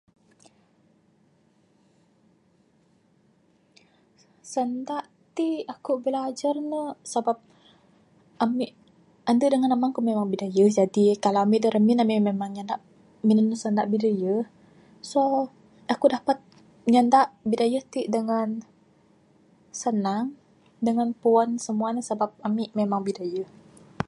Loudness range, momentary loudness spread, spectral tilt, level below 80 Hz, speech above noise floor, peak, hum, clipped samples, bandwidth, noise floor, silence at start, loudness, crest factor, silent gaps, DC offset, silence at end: 8 LU; 12 LU; -6 dB/octave; -70 dBFS; 40 dB; -6 dBFS; none; under 0.1%; 11.5 kHz; -63 dBFS; 4.45 s; -25 LUFS; 20 dB; none; under 0.1%; 0.05 s